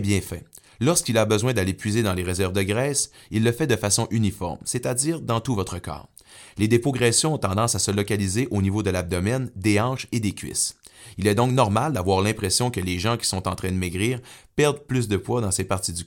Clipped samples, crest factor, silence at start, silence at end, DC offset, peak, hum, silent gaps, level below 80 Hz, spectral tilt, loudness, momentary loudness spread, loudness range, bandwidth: under 0.1%; 20 dB; 0 s; 0 s; under 0.1%; -4 dBFS; none; none; -50 dBFS; -4.5 dB/octave; -23 LUFS; 7 LU; 2 LU; 17.5 kHz